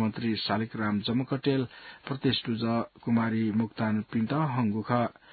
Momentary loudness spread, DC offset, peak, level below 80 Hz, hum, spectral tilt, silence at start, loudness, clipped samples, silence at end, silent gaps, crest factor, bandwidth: 3 LU; under 0.1%; -10 dBFS; -62 dBFS; none; -11 dB/octave; 0 s; -29 LUFS; under 0.1%; 0.2 s; none; 18 dB; 4.8 kHz